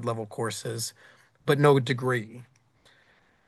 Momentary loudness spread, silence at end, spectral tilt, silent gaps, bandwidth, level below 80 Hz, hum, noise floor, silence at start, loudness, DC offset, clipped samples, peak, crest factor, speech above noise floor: 15 LU; 1.05 s; -5.5 dB/octave; none; 12.5 kHz; -70 dBFS; none; -63 dBFS; 0 s; -26 LUFS; under 0.1%; under 0.1%; -6 dBFS; 22 dB; 37 dB